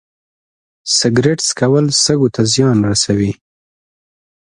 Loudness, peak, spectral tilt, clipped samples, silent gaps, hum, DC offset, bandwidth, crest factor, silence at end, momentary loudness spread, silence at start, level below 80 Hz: -13 LUFS; 0 dBFS; -4 dB/octave; under 0.1%; none; none; under 0.1%; 11.5 kHz; 16 dB; 1.2 s; 6 LU; 0.85 s; -44 dBFS